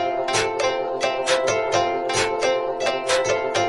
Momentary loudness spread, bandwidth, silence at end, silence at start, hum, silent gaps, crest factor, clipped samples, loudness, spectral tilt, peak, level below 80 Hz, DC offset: 3 LU; 11.5 kHz; 0 s; 0 s; none; none; 14 dB; under 0.1%; -21 LUFS; -2.5 dB/octave; -8 dBFS; -56 dBFS; under 0.1%